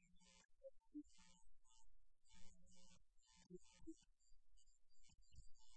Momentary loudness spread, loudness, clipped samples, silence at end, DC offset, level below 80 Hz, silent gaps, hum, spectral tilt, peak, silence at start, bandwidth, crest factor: 7 LU; -64 LUFS; under 0.1%; 0 s; under 0.1%; -74 dBFS; 0.45-0.49 s; none; -4.5 dB/octave; -44 dBFS; 0 s; 8.2 kHz; 16 dB